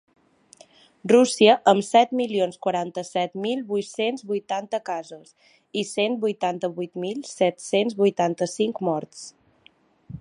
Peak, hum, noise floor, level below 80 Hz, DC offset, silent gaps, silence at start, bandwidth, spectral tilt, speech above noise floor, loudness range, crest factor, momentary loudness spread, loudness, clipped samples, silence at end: -2 dBFS; none; -58 dBFS; -70 dBFS; under 0.1%; none; 1.05 s; 11.5 kHz; -4.5 dB/octave; 36 dB; 7 LU; 22 dB; 14 LU; -23 LUFS; under 0.1%; 0.05 s